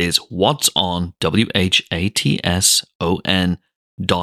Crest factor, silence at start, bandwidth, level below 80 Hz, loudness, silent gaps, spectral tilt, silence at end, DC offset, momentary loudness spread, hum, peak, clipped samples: 18 dB; 0 s; 16 kHz; -42 dBFS; -17 LUFS; 2.95-3.00 s, 3.76-3.98 s; -3 dB/octave; 0 s; under 0.1%; 7 LU; none; 0 dBFS; under 0.1%